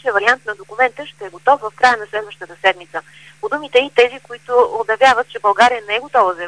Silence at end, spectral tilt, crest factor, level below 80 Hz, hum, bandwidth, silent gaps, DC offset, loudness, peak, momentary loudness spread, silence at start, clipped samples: 0 s; -2 dB/octave; 16 dB; -58 dBFS; none; 10.5 kHz; none; 0.2%; -16 LUFS; 0 dBFS; 16 LU; 0.05 s; under 0.1%